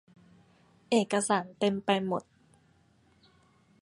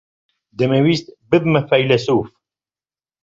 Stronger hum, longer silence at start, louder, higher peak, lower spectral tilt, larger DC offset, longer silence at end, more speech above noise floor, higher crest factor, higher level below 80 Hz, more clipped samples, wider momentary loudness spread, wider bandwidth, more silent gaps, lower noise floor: neither; first, 0.9 s vs 0.6 s; second, -29 LUFS vs -17 LUFS; second, -10 dBFS vs -2 dBFS; second, -4.5 dB/octave vs -7 dB/octave; neither; first, 1.6 s vs 0.95 s; second, 37 dB vs over 74 dB; about the same, 22 dB vs 18 dB; second, -74 dBFS vs -54 dBFS; neither; about the same, 5 LU vs 7 LU; first, 11.5 kHz vs 7.6 kHz; neither; second, -65 dBFS vs under -90 dBFS